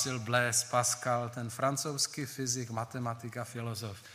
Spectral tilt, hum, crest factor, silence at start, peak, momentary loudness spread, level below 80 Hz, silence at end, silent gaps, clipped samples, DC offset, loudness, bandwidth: -3 dB/octave; none; 22 dB; 0 s; -12 dBFS; 11 LU; -72 dBFS; 0 s; none; under 0.1%; under 0.1%; -33 LUFS; 15.5 kHz